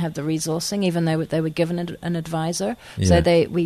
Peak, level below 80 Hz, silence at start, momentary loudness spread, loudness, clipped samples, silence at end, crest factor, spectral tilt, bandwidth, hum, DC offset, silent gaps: -4 dBFS; -40 dBFS; 0 s; 9 LU; -22 LUFS; under 0.1%; 0 s; 18 dB; -5.5 dB/octave; 13.5 kHz; none; under 0.1%; none